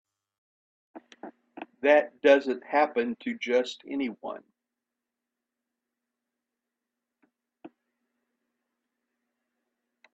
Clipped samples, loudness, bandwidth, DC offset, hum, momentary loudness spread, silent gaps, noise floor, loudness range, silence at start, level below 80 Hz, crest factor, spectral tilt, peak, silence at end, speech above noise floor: under 0.1%; -26 LUFS; 8 kHz; under 0.1%; none; 24 LU; none; -88 dBFS; 15 LU; 0.95 s; -80 dBFS; 24 dB; -4 dB/octave; -8 dBFS; 2.45 s; 62 dB